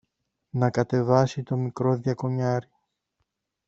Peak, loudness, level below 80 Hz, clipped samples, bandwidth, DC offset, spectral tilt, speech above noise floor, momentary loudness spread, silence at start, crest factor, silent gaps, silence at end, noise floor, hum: -4 dBFS; -25 LUFS; -60 dBFS; under 0.1%; 7.6 kHz; under 0.1%; -8 dB/octave; 54 dB; 7 LU; 0.55 s; 22 dB; none; 1.05 s; -78 dBFS; none